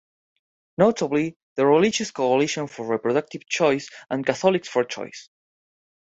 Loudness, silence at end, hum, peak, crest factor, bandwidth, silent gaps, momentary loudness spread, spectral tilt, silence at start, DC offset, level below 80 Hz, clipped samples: -23 LUFS; 0.8 s; none; -4 dBFS; 20 dB; 8.2 kHz; 1.36-1.56 s; 10 LU; -4.5 dB/octave; 0.8 s; under 0.1%; -66 dBFS; under 0.1%